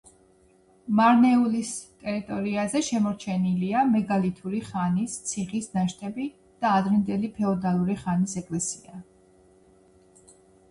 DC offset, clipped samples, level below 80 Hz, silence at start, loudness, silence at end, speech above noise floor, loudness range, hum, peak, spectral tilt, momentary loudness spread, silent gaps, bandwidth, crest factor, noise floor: under 0.1%; under 0.1%; -60 dBFS; 0.85 s; -25 LUFS; 1.7 s; 35 dB; 4 LU; none; -8 dBFS; -5.5 dB/octave; 13 LU; none; 11.5 kHz; 18 dB; -59 dBFS